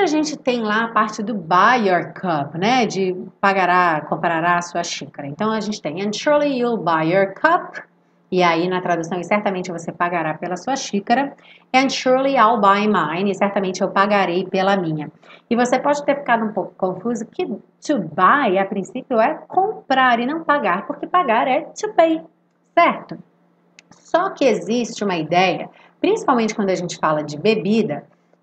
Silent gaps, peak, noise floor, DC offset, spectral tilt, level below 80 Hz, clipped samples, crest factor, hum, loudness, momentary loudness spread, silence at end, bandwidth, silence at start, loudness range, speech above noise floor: none; 0 dBFS; -58 dBFS; under 0.1%; -5 dB/octave; -70 dBFS; under 0.1%; 18 dB; none; -19 LUFS; 10 LU; 0.4 s; 9 kHz; 0 s; 3 LU; 39 dB